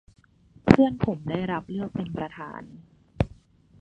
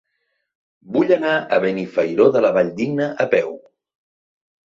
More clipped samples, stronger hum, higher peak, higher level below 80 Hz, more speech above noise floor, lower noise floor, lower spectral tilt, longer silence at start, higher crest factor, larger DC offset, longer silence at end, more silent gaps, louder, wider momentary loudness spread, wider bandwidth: neither; neither; about the same, 0 dBFS vs -2 dBFS; first, -46 dBFS vs -64 dBFS; second, 27 dB vs 55 dB; second, -57 dBFS vs -72 dBFS; first, -8.5 dB/octave vs -7 dB/octave; second, 0.65 s vs 0.9 s; first, 26 dB vs 18 dB; neither; second, 0.55 s vs 1.2 s; neither; second, -26 LUFS vs -18 LUFS; first, 18 LU vs 7 LU; first, 8.6 kHz vs 7.4 kHz